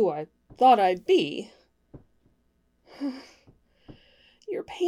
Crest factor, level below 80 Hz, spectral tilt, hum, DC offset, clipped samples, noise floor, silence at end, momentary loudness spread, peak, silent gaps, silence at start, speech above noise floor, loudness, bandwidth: 20 dB; -66 dBFS; -5.5 dB/octave; none; under 0.1%; under 0.1%; -69 dBFS; 0 s; 25 LU; -8 dBFS; none; 0 s; 45 dB; -24 LUFS; 12 kHz